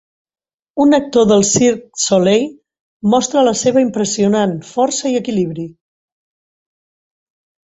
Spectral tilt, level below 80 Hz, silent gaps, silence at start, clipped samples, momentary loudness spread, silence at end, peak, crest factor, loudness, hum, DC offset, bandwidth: -4.5 dB/octave; -54 dBFS; 2.81-3.00 s; 0.75 s; under 0.1%; 10 LU; 2.05 s; 0 dBFS; 16 dB; -14 LUFS; none; under 0.1%; 8.2 kHz